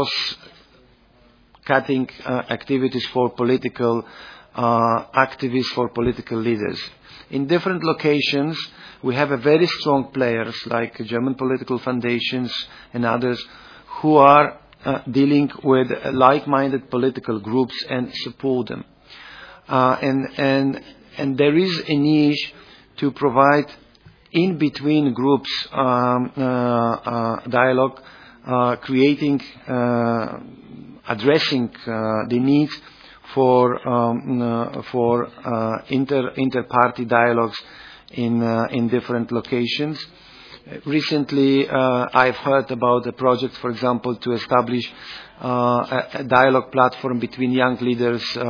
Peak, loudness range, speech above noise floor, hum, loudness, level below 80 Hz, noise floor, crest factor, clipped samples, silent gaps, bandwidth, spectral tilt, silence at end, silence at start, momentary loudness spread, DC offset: 0 dBFS; 4 LU; 34 dB; none; -20 LUFS; -56 dBFS; -54 dBFS; 20 dB; under 0.1%; none; 5.4 kHz; -7 dB/octave; 0 s; 0 s; 11 LU; under 0.1%